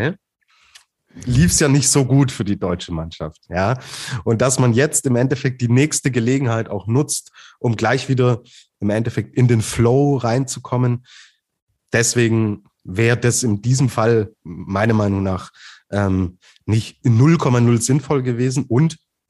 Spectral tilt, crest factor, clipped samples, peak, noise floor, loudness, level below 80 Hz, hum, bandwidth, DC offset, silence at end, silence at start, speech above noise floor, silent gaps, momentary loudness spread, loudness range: -5.5 dB/octave; 16 dB; under 0.1%; -2 dBFS; -59 dBFS; -18 LUFS; -42 dBFS; none; 12.5 kHz; under 0.1%; 0.35 s; 0 s; 42 dB; 11.62-11.67 s; 11 LU; 2 LU